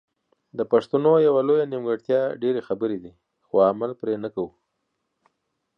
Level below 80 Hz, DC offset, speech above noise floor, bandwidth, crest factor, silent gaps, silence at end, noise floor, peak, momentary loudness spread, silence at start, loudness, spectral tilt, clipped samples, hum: -68 dBFS; under 0.1%; 55 dB; 5.8 kHz; 16 dB; none; 1.3 s; -77 dBFS; -6 dBFS; 13 LU; 0.55 s; -23 LUFS; -8.5 dB/octave; under 0.1%; none